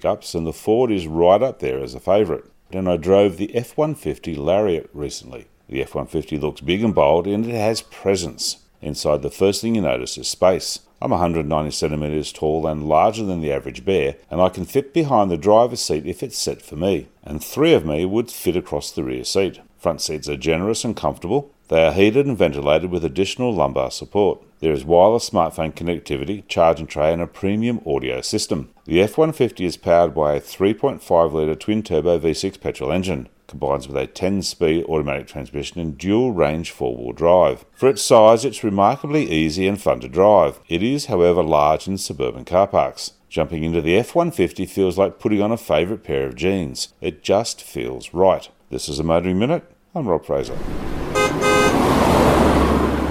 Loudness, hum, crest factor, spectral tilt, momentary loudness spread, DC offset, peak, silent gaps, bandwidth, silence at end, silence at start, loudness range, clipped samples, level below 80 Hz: -19 LUFS; none; 20 dB; -5.5 dB/octave; 11 LU; under 0.1%; 0 dBFS; none; 17 kHz; 0 s; 0.05 s; 5 LU; under 0.1%; -38 dBFS